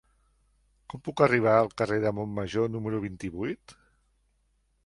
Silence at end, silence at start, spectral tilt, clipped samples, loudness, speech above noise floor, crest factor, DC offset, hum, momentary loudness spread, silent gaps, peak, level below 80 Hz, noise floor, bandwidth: 1.15 s; 0.95 s; -7 dB/octave; under 0.1%; -27 LUFS; 44 dB; 22 dB; under 0.1%; none; 15 LU; none; -8 dBFS; -58 dBFS; -71 dBFS; 11.5 kHz